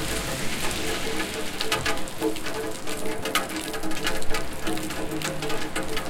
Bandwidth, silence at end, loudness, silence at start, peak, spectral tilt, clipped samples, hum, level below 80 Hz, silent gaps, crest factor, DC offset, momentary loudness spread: 17 kHz; 0 s; -28 LUFS; 0 s; -6 dBFS; -3 dB/octave; under 0.1%; none; -38 dBFS; none; 18 dB; under 0.1%; 5 LU